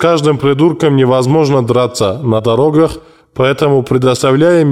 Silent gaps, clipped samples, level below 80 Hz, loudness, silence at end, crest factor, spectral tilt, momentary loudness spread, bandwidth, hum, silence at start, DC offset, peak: none; under 0.1%; -42 dBFS; -11 LUFS; 0 s; 10 dB; -6.5 dB/octave; 5 LU; 14.5 kHz; none; 0 s; 0.3%; -2 dBFS